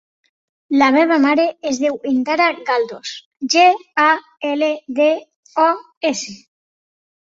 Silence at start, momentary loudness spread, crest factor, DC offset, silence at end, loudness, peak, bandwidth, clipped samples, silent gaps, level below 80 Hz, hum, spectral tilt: 0.7 s; 12 LU; 16 dB; under 0.1%; 0.85 s; -17 LUFS; -2 dBFS; 7.8 kHz; under 0.1%; 3.25-3.31 s, 5.36-5.43 s, 5.97-6.01 s; -66 dBFS; none; -2.5 dB/octave